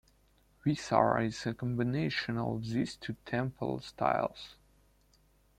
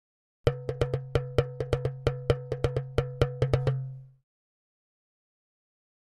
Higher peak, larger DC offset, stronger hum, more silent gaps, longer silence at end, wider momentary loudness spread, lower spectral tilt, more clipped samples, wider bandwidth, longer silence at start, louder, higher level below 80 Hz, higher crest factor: about the same, -10 dBFS vs -8 dBFS; neither; first, 50 Hz at -60 dBFS vs none; neither; second, 1.05 s vs 2 s; first, 9 LU vs 5 LU; about the same, -6.5 dB/octave vs -7.5 dB/octave; neither; first, 13.5 kHz vs 11 kHz; first, 0.65 s vs 0.45 s; second, -33 LUFS vs -30 LUFS; second, -62 dBFS vs -44 dBFS; about the same, 24 dB vs 22 dB